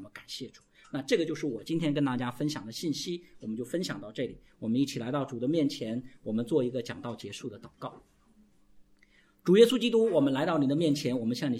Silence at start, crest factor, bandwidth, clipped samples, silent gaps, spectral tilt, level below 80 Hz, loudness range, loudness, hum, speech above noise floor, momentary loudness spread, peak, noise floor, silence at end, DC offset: 0 s; 22 dB; 15.5 kHz; under 0.1%; none; -6 dB/octave; -68 dBFS; 8 LU; -30 LUFS; none; 34 dB; 15 LU; -8 dBFS; -63 dBFS; 0 s; under 0.1%